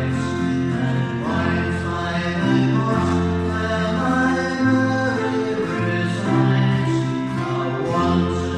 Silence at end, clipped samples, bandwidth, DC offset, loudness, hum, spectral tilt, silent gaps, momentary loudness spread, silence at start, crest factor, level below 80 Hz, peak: 0 s; under 0.1%; 10 kHz; under 0.1%; -20 LUFS; none; -7 dB/octave; none; 5 LU; 0 s; 14 dB; -42 dBFS; -6 dBFS